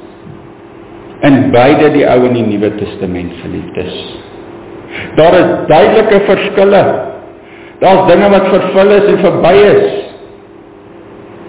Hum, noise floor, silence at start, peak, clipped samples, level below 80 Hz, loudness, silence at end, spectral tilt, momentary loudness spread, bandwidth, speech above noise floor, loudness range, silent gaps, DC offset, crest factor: none; -34 dBFS; 0 s; 0 dBFS; 0.9%; -38 dBFS; -8 LUFS; 0 s; -10.5 dB/octave; 18 LU; 4 kHz; 27 dB; 5 LU; none; under 0.1%; 10 dB